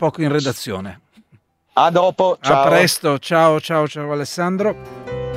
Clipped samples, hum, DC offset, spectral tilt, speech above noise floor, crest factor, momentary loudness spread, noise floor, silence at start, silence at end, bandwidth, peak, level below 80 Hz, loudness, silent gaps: under 0.1%; none; under 0.1%; -5 dB/octave; 39 dB; 18 dB; 14 LU; -56 dBFS; 0 s; 0 s; 16 kHz; 0 dBFS; -52 dBFS; -17 LUFS; none